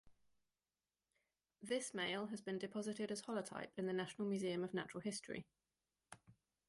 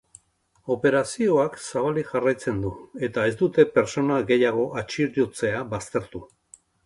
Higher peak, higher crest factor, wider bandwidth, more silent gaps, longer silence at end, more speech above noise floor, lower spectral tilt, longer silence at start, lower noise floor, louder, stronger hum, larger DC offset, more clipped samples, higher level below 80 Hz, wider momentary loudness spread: second, -30 dBFS vs -4 dBFS; about the same, 18 dB vs 20 dB; about the same, 11.5 kHz vs 11.5 kHz; neither; second, 0.35 s vs 0.6 s; first, over 46 dB vs 42 dB; about the same, -4.5 dB/octave vs -5.5 dB/octave; second, 0.05 s vs 0.65 s; first, under -90 dBFS vs -65 dBFS; second, -45 LUFS vs -24 LUFS; neither; neither; neither; second, -84 dBFS vs -54 dBFS; first, 14 LU vs 10 LU